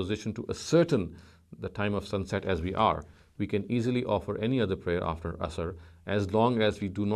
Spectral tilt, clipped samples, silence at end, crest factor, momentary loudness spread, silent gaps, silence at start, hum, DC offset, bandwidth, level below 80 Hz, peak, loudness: -6.5 dB/octave; under 0.1%; 0 s; 20 dB; 11 LU; none; 0 s; none; under 0.1%; 13 kHz; -48 dBFS; -10 dBFS; -30 LUFS